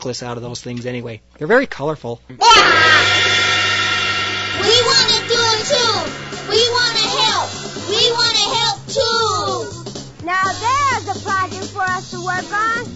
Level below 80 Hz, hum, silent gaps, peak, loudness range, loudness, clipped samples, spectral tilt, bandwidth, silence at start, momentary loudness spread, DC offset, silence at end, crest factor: -48 dBFS; none; none; 0 dBFS; 7 LU; -14 LUFS; under 0.1%; -2 dB/octave; 8.2 kHz; 0 s; 17 LU; under 0.1%; 0 s; 16 dB